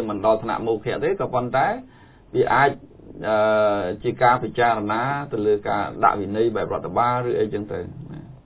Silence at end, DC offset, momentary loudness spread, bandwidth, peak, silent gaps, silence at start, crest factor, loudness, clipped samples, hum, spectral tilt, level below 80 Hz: 0.1 s; under 0.1%; 11 LU; 4 kHz; -2 dBFS; none; 0 s; 20 dB; -22 LUFS; under 0.1%; none; -10 dB/octave; -50 dBFS